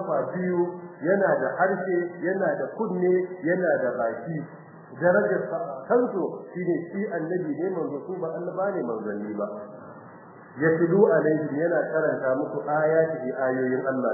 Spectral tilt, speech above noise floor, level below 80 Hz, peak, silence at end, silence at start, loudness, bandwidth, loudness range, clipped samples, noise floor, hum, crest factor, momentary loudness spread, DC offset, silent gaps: -14 dB/octave; 21 dB; -76 dBFS; -6 dBFS; 0 s; 0 s; -26 LUFS; 2.1 kHz; 6 LU; under 0.1%; -46 dBFS; none; 20 dB; 10 LU; under 0.1%; none